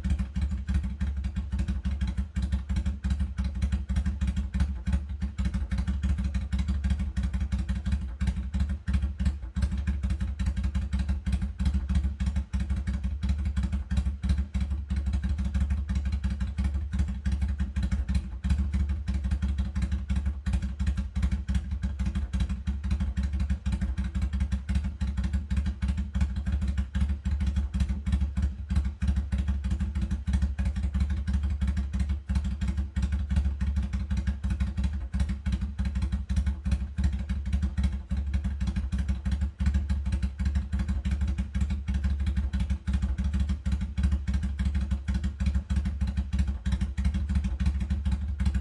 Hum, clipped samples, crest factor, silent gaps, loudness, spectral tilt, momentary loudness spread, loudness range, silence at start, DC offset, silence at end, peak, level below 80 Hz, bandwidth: none; under 0.1%; 14 dB; none; -31 LUFS; -7 dB/octave; 3 LU; 1 LU; 0 s; under 0.1%; 0 s; -14 dBFS; -30 dBFS; 10.5 kHz